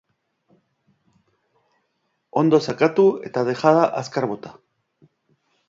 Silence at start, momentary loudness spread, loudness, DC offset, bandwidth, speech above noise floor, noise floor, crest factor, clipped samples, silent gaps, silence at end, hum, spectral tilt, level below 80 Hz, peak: 2.35 s; 11 LU; -20 LUFS; under 0.1%; 7.8 kHz; 53 dB; -72 dBFS; 20 dB; under 0.1%; none; 1.15 s; none; -6.5 dB/octave; -68 dBFS; -2 dBFS